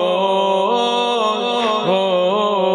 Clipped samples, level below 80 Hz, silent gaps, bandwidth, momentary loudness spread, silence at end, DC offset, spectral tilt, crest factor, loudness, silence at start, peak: under 0.1%; -74 dBFS; none; 10 kHz; 1 LU; 0 s; under 0.1%; -4.5 dB/octave; 12 dB; -17 LUFS; 0 s; -4 dBFS